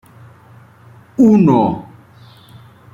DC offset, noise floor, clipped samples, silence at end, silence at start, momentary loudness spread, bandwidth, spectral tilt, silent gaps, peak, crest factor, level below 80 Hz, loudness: under 0.1%; -44 dBFS; under 0.1%; 1.1 s; 1.2 s; 18 LU; 7.4 kHz; -9.5 dB/octave; none; -2 dBFS; 16 dB; -52 dBFS; -12 LUFS